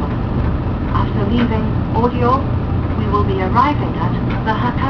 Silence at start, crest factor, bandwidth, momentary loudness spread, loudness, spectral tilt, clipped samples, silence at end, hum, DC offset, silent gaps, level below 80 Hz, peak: 0 s; 16 dB; 5.4 kHz; 4 LU; -17 LUFS; -9.5 dB/octave; under 0.1%; 0 s; none; under 0.1%; none; -26 dBFS; 0 dBFS